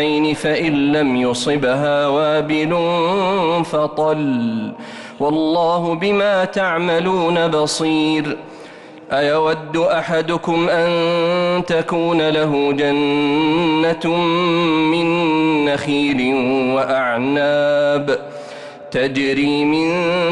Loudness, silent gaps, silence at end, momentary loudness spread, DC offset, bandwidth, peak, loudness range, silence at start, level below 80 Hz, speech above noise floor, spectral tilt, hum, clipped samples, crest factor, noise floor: -17 LUFS; none; 0 s; 5 LU; under 0.1%; 11.5 kHz; -8 dBFS; 2 LU; 0 s; -54 dBFS; 21 dB; -5.5 dB/octave; none; under 0.1%; 8 dB; -37 dBFS